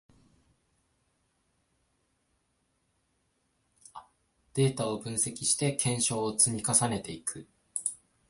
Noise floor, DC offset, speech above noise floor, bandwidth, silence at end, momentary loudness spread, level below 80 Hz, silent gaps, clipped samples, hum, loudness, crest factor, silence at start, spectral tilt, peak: -75 dBFS; under 0.1%; 46 dB; 12 kHz; 0.35 s; 12 LU; -64 dBFS; none; under 0.1%; none; -28 LUFS; 26 dB; 3.95 s; -3.5 dB/octave; -8 dBFS